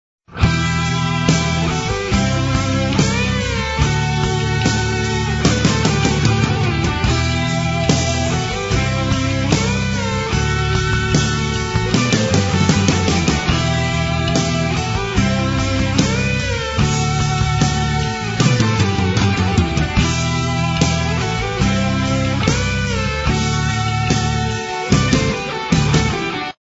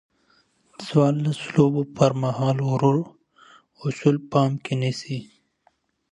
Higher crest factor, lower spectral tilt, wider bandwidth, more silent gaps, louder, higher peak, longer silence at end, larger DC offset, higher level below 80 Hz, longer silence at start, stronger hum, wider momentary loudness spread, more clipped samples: about the same, 16 dB vs 20 dB; second, -5 dB/octave vs -7.5 dB/octave; second, 8 kHz vs 10.5 kHz; neither; first, -17 LUFS vs -23 LUFS; first, 0 dBFS vs -4 dBFS; second, 0.1 s vs 0.9 s; neither; first, -28 dBFS vs -62 dBFS; second, 0.3 s vs 0.8 s; neither; second, 4 LU vs 11 LU; neither